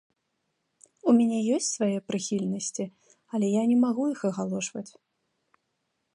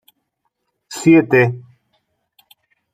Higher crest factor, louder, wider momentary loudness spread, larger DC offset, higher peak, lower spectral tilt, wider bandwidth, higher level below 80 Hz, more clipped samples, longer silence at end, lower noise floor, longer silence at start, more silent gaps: about the same, 18 dB vs 18 dB; second, -27 LUFS vs -14 LUFS; second, 12 LU vs 21 LU; neither; second, -10 dBFS vs -2 dBFS; second, -5 dB/octave vs -6.5 dB/octave; second, 11 kHz vs 14.5 kHz; second, -76 dBFS vs -62 dBFS; neither; about the same, 1.25 s vs 1.35 s; first, -78 dBFS vs -72 dBFS; first, 1.05 s vs 0.9 s; neither